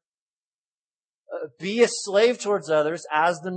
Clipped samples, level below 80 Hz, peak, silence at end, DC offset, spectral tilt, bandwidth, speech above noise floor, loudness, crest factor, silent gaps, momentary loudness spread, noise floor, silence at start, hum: under 0.1%; -84 dBFS; -6 dBFS; 0 s; under 0.1%; -3.5 dB/octave; 8.8 kHz; over 67 dB; -22 LUFS; 20 dB; none; 15 LU; under -90 dBFS; 1.3 s; none